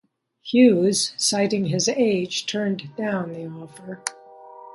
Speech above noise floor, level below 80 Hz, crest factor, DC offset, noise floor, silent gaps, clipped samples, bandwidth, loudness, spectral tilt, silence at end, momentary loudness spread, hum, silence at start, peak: 22 dB; -68 dBFS; 20 dB; under 0.1%; -44 dBFS; none; under 0.1%; 11.5 kHz; -22 LUFS; -4 dB/octave; 0.05 s; 18 LU; none; 0.45 s; -4 dBFS